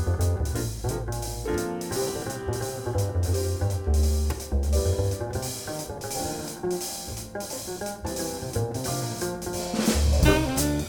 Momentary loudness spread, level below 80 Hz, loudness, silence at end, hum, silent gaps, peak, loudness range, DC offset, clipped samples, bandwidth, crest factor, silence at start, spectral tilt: 9 LU; -32 dBFS; -28 LUFS; 0 s; none; none; -6 dBFS; 5 LU; under 0.1%; under 0.1%; over 20 kHz; 20 dB; 0 s; -5 dB/octave